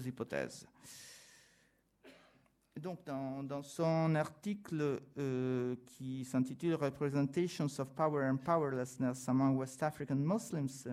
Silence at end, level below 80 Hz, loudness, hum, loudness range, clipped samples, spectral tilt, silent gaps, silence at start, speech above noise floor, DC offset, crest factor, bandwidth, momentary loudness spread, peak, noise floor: 0 s; -74 dBFS; -37 LUFS; none; 11 LU; under 0.1%; -7 dB/octave; none; 0 s; 36 dB; under 0.1%; 18 dB; 15.5 kHz; 13 LU; -20 dBFS; -73 dBFS